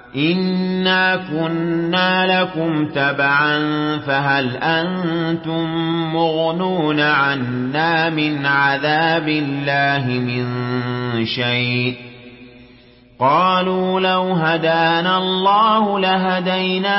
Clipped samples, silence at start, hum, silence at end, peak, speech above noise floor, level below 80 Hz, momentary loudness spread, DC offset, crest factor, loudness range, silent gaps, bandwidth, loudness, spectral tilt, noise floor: under 0.1%; 0.05 s; none; 0 s; -4 dBFS; 29 dB; -56 dBFS; 6 LU; under 0.1%; 14 dB; 3 LU; none; 5.8 kHz; -17 LUFS; -10 dB/octave; -46 dBFS